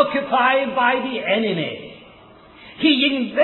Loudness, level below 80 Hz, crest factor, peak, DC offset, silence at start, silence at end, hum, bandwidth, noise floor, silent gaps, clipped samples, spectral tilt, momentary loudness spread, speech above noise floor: -19 LUFS; -60 dBFS; 18 dB; -2 dBFS; under 0.1%; 0 s; 0 s; none; 4.3 kHz; -46 dBFS; none; under 0.1%; -7.5 dB/octave; 11 LU; 27 dB